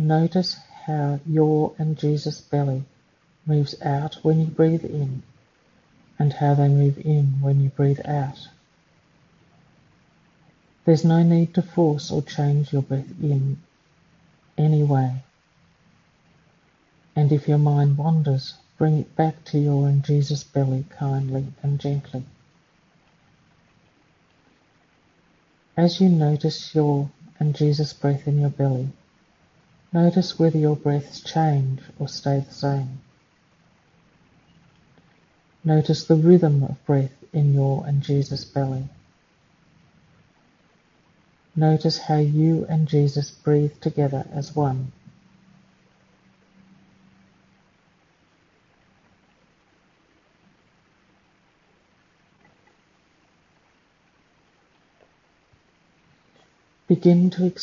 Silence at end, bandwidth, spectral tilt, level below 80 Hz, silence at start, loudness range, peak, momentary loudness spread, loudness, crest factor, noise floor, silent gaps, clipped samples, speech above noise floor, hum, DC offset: 0 s; 7.2 kHz; -8.5 dB/octave; -62 dBFS; 0 s; 9 LU; -4 dBFS; 11 LU; -22 LUFS; 20 dB; -62 dBFS; none; under 0.1%; 42 dB; none; under 0.1%